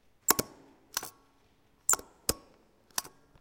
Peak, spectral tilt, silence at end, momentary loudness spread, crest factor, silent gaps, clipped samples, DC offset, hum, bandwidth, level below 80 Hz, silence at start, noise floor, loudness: -2 dBFS; -1 dB/octave; 0.35 s; 19 LU; 34 dB; none; under 0.1%; under 0.1%; none; 17 kHz; -58 dBFS; 0.3 s; -67 dBFS; -31 LUFS